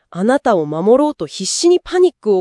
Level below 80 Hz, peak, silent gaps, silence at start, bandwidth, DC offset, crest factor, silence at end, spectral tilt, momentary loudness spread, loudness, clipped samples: -52 dBFS; 0 dBFS; none; 0.15 s; 12 kHz; under 0.1%; 14 dB; 0 s; -4.5 dB/octave; 6 LU; -15 LUFS; under 0.1%